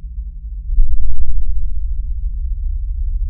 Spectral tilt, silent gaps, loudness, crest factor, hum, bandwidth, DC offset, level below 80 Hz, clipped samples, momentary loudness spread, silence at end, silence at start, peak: -19 dB/octave; none; -25 LUFS; 10 dB; none; 0.2 kHz; under 0.1%; -16 dBFS; under 0.1%; 9 LU; 0 s; 0.05 s; 0 dBFS